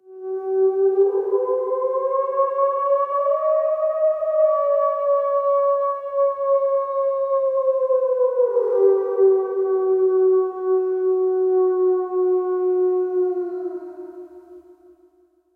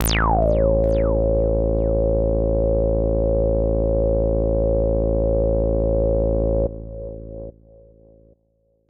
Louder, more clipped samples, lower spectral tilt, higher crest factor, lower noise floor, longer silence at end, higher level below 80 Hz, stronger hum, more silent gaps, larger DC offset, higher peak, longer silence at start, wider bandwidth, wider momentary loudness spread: about the same, -20 LUFS vs -20 LUFS; neither; about the same, -8 dB/octave vs -7 dB/octave; about the same, 14 dB vs 14 dB; second, -59 dBFS vs -65 dBFS; second, 0.95 s vs 1.4 s; second, -74 dBFS vs -24 dBFS; neither; neither; neither; about the same, -6 dBFS vs -6 dBFS; about the same, 0.1 s vs 0 s; second, 2.4 kHz vs 9.6 kHz; second, 5 LU vs 12 LU